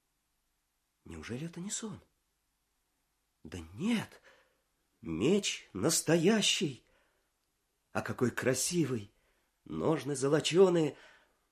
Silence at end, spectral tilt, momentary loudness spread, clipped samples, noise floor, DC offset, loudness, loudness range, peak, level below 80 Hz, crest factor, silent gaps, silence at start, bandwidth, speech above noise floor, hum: 0.6 s; -4 dB/octave; 21 LU; under 0.1%; -80 dBFS; under 0.1%; -31 LUFS; 13 LU; -12 dBFS; -64 dBFS; 22 dB; none; 1.05 s; 15.5 kHz; 49 dB; none